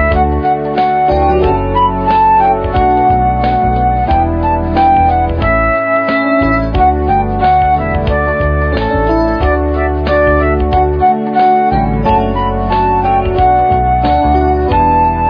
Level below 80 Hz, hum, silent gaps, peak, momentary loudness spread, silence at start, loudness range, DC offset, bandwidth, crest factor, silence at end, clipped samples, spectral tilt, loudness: -20 dBFS; none; none; 0 dBFS; 3 LU; 0 s; 1 LU; 0.2%; 5.2 kHz; 10 dB; 0 s; under 0.1%; -9.5 dB/octave; -11 LUFS